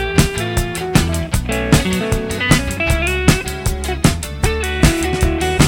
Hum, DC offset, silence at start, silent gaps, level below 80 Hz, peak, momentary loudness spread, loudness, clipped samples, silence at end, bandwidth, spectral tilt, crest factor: none; under 0.1%; 0 s; none; -22 dBFS; 0 dBFS; 5 LU; -17 LUFS; under 0.1%; 0 s; 17.5 kHz; -4.5 dB/octave; 16 dB